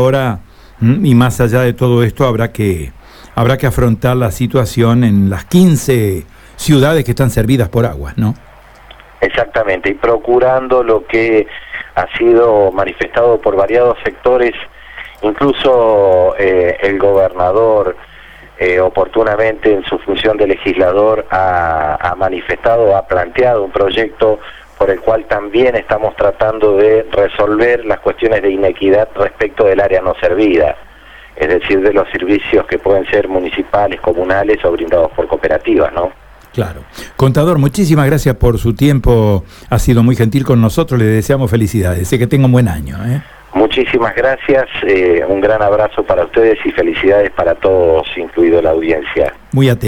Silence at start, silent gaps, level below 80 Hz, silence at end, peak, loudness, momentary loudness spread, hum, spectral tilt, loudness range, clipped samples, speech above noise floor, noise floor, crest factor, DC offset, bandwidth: 0 s; none; -30 dBFS; 0 s; 0 dBFS; -12 LUFS; 7 LU; none; -7 dB/octave; 2 LU; under 0.1%; 27 dB; -38 dBFS; 12 dB; under 0.1%; 18.5 kHz